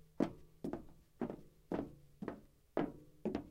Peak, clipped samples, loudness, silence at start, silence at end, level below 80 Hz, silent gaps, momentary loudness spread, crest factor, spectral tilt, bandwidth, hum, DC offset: -20 dBFS; under 0.1%; -45 LUFS; 0.15 s; 0 s; -64 dBFS; none; 12 LU; 24 dB; -8 dB/octave; 16 kHz; none; under 0.1%